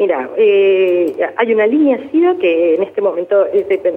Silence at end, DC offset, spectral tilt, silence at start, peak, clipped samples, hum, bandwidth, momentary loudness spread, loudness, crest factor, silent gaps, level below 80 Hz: 0 s; under 0.1%; -7 dB/octave; 0 s; -2 dBFS; under 0.1%; none; 3.9 kHz; 5 LU; -13 LUFS; 12 dB; none; -62 dBFS